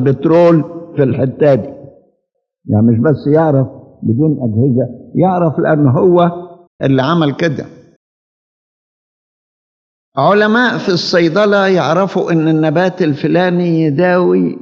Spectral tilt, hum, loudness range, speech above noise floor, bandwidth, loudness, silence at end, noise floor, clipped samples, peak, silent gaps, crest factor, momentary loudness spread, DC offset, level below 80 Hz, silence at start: -7.5 dB/octave; none; 7 LU; 57 dB; 7.2 kHz; -12 LUFS; 0.05 s; -69 dBFS; under 0.1%; 0 dBFS; 6.67-6.79 s, 7.96-10.12 s; 12 dB; 8 LU; under 0.1%; -58 dBFS; 0 s